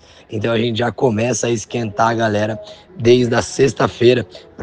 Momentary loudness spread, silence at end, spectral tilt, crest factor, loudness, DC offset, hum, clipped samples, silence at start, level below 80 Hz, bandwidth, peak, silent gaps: 10 LU; 0 s; -5 dB/octave; 16 dB; -17 LUFS; under 0.1%; none; under 0.1%; 0.3 s; -48 dBFS; 10 kHz; -2 dBFS; none